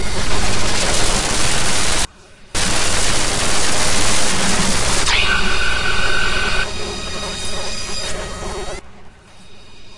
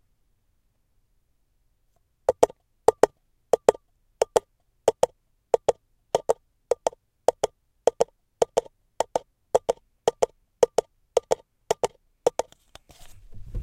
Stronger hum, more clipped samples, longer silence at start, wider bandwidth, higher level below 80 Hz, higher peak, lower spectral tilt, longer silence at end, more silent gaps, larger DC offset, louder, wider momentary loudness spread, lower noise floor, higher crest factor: neither; neither; second, 0 s vs 2.3 s; second, 11.5 kHz vs 17 kHz; first, -26 dBFS vs -52 dBFS; about the same, 0 dBFS vs 0 dBFS; second, -2 dB/octave vs -3.5 dB/octave; about the same, 0 s vs 0 s; neither; first, 10% vs under 0.1%; first, -18 LUFS vs -27 LUFS; about the same, 9 LU vs 8 LU; second, -41 dBFS vs -69 dBFS; second, 14 dB vs 28 dB